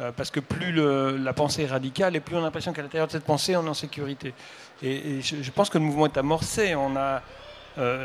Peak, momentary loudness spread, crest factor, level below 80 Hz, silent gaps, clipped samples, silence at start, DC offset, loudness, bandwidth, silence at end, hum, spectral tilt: -6 dBFS; 11 LU; 20 dB; -54 dBFS; none; under 0.1%; 0 s; under 0.1%; -26 LUFS; 15.5 kHz; 0 s; none; -5 dB/octave